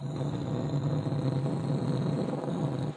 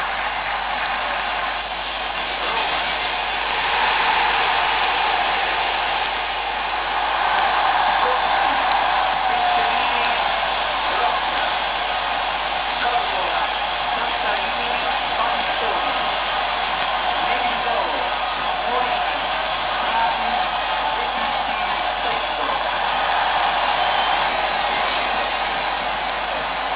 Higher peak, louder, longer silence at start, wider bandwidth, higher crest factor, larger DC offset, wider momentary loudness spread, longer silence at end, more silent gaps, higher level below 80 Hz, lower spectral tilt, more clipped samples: second, -16 dBFS vs -2 dBFS; second, -31 LUFS vs -20 LUFS; about the same, 0 s vs 0 s; first, 9.4 kHz vs 4 kHz; about the same, 14 dB vs 18 dB; neither; about the same, 3 LU vs 4 LU; about the same, 0 s vs 0 s; neither; second, -58 dBFS vs -44 dBFS; first, -8.5 dB/octave vs -6 dB/octave; neither